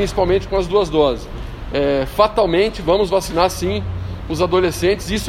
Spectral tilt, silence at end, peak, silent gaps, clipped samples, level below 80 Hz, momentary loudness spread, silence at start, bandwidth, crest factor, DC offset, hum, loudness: -5.5 dB/octave; 0 s; 0 dBFS; none; under 0.1%; -32 dBFS; 10 LU; 0 s; 16 kHz; 18 dB; under 0.1%; none; -18 LUFS